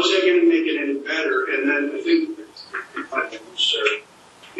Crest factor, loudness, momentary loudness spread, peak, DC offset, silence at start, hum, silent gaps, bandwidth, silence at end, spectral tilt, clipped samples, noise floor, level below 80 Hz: 18 dB; -21 LUFS; 14 LU; -4 dBFS; under 0.1%; 0 s; none; none; 9.4 kHz; 0 s; -1.5 dB/octave; under 0.1%; -47 dBFS; -76 dBFS